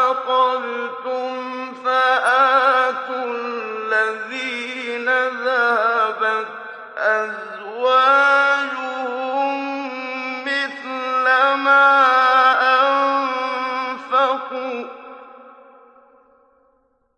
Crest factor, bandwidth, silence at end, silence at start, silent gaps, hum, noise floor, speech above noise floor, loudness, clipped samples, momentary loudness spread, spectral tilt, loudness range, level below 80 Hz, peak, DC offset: 16 dB; 10.5 kHz; 1.65 s; 0 s; none; none; -63 dBFS; 42 dB; -18 LUFS; under 0.1%; 13 LU; -2 dB/octave; 5 LU; -82 dBFS; -4 dBFS; under 0.1%